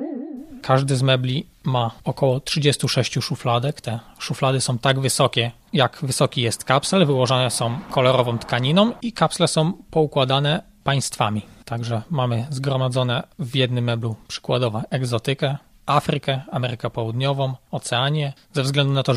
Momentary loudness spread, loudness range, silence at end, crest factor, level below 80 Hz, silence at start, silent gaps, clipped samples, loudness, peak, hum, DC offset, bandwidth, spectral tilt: 8 LU; 4 LU; 0 s; 20 dB; -54 dBFS; 0 s; none; under 0.1%; -21 LUFS; 0 dBFS; none; under 0.1%; 14 kHz; -5 dB/octave